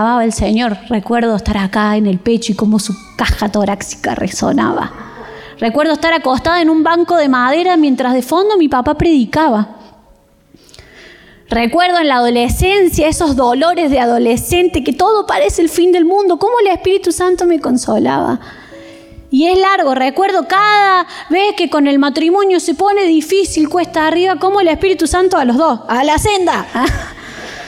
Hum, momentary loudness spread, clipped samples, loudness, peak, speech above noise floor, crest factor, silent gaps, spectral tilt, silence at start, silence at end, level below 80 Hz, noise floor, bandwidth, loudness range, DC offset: none; 6 LU; under 0.1%; -12 LUFS; -2 dBFS; 36 dB; 10 dB; none; -4.5 dB/octave; 0 s; 0 s; -32 dBFS; -48 dBFS; 16.5 kHz; 4 LU; under 0.1%